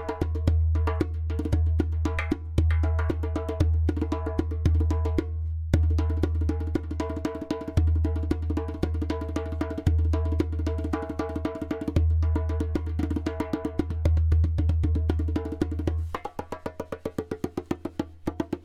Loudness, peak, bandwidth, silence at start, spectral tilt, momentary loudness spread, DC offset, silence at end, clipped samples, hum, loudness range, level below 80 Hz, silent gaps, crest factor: -28 LUFS; -6 dBFS; 7.2 kHz; 0 s; -8.5 dB/octave; 9 LU; under 0.1%; 0.05 s; under 0.1%; none; 2 LU; -30 dBFS; none; 20 dB